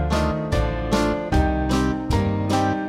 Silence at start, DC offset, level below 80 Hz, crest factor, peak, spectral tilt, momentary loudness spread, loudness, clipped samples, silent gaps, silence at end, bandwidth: 0 s; under 0.1%; -28 dBFS; 14 dB; -8 dBFS; -6.5 dB/octave; 2 LU; -22 LUFS; under 0.1%; none; 0 s; 15 kHz